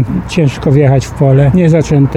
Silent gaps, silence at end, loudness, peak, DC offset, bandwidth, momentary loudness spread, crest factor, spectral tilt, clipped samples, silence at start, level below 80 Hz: none; 0 s; -10 LUFS; 0 dBFS; under 0.1%; 9.2 kHz; 5 LU; 8 dB; -8 dB/octave; under 0.1%; 0 s; -28 dBFS